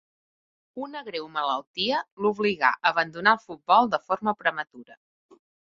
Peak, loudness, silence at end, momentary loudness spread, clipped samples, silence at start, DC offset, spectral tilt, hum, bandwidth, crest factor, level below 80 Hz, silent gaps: -4 dBFS; -25 LUFS; 0.85 s; 15 LU; under 0.1%; 0.75 s; under 0.1%; -5 dB/octave; none; 7.4 kHz; 22 dB; -70 dBFS; 1.67-1.74 s, 2.12-2.17 s